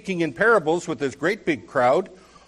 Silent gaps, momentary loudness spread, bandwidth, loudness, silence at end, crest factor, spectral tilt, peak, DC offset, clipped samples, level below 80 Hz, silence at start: none; 8 LU; 12 kHz; -22 LUFS; 0.35 s; 16 dB; -5.5 dB/octave; -8 dBFS; under 0.1%; under 0.1%; -60 dBFS; 0.05 s